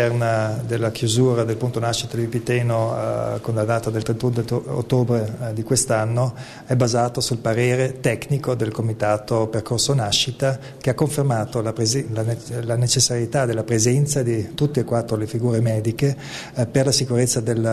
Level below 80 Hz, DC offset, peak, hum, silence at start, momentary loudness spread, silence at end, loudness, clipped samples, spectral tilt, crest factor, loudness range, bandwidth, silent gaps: -50 dBFS; under 0.1%; -4 dBFS; none; 0 s; 6 LU; 0 s; -21 LUFS; under 0.1%; -5 dB/octave; 16 dB; 2 LU; 13.5 kHz; none